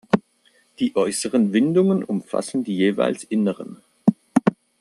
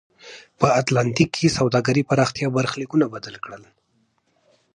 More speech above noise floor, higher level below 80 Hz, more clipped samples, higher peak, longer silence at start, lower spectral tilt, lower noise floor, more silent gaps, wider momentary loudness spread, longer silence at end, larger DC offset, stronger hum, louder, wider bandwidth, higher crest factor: second, 40 dB vs 46 dB; second, -66 dBFS vs -54 dBFS; neither; about the same, -2 dBFS vs -2 dBFS; about the same, 0.15 s vs 0.25 s; about the same, -6 dB/octave vs -5.5 dB/octave; second, -60 dBFS vs -66 dBFS; neither; second, 7 LU vs 18 LU; second, 0.3 s vs 1.15 s; neither; neither; about the same, -21 LUFS vs -20 LUFS; first, 12.5 kHz vs 11 kHz; about the same, 18 dB vs 20 dB